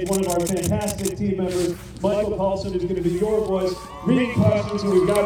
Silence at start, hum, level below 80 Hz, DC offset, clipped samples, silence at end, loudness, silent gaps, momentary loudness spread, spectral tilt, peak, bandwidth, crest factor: 0 s; none; -42 dBFS; under 0.1%; under 0.1%; 0 s; -22 LUFS; none; 6 LU; -6 dB/octave; -6 dBFS; 19.5 kHz; 16 dB